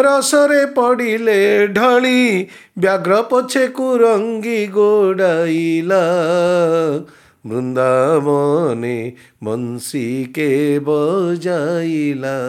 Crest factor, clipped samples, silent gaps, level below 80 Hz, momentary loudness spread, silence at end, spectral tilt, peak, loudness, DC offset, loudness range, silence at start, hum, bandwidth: 14 dB; under 0.1%; none; -68 dBFS; 10 LU; 0 s; -5 dB/octave; -2 dBFS; -15 LUFS; under 0.1%; 4 LU; 0 s; none; 16.5 kHz